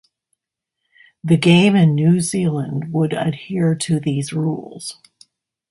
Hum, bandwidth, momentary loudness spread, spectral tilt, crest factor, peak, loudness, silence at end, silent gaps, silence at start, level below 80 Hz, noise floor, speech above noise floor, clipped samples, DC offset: none; 11.5 kHz; 16 LU; -6 dB/octave; 18 dB; -2 dBFS; -17 LUFS; 0.8 s; none; 1.25 s; -58 dBFS; -81 dBFS; 64 dB; under 0.1%; under 0.1%